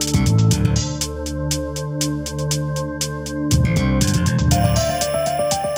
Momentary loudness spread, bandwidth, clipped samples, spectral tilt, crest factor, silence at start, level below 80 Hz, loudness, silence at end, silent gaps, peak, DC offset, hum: 8 LU; over 20 kHz; under 0.1%; -5 dB/octave; 16 dB; 0 s; -30 dBFS; -19 LUFS; 0 s; none; -4 dBFS; under 0.1%; none